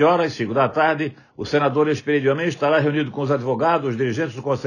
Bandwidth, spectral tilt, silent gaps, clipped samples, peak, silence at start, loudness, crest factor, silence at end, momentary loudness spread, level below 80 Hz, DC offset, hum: 9.8 kHz; -6.5 dB/octave; none; under 0.1%; -4 dBFS; 0 s; -20 LUFS; 14 dB; 0 s; 6 LU; -64 dBFS; under 0.1%; none